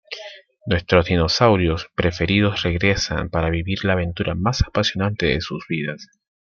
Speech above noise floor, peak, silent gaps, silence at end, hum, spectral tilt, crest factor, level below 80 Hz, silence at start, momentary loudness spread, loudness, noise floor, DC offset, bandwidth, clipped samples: 20 dB; -2 dBFS; none; 0.45 s; none; -5.5 dB/octave; 20 dB; -36 dBFS; 0.1 s; 10 LU; -20 LUFS; -40 dBFS; under 0.1%; 7.2 kHz; under 0.1%